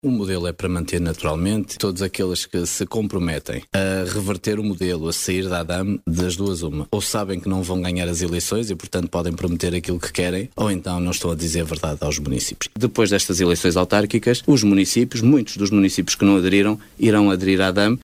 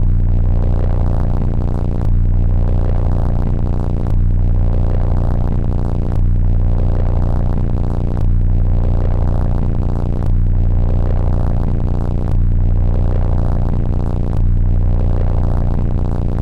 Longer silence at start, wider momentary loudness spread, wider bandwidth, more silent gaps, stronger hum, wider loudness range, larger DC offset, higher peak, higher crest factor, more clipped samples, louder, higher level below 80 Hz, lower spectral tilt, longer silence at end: about the same, 0.05 s vs 0 s; first, 8 LU vs 2 LU; first, 16 kHz vs 2.8 kHz; neither; neither; first, 6 LU vs 0 LU; second, under 0.1% vs 5%; about the same, -4 dBFS vs -6 dBFS; first, 16 dB vs 6 dB; neither; about the same, -20 LUFS vs -18 LUFS; second, -40 dBFS vs -14 dBFS; second, -5 dB/octave vs -10.5 dB/octave; about the same, 0.05 s vs 0 s